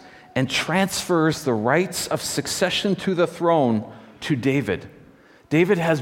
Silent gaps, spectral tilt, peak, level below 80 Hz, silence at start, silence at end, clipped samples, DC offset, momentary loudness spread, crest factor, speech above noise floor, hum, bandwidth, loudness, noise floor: none; -4.5 dB/octave; -4 dBFS; -56 dBFS; 0.05 s; 0 s; under 0.1%; under 0.1%; 8 LU; 18 dB; 29 dB; none; 17.5 kHz; -22 LUFS; -50 dBFS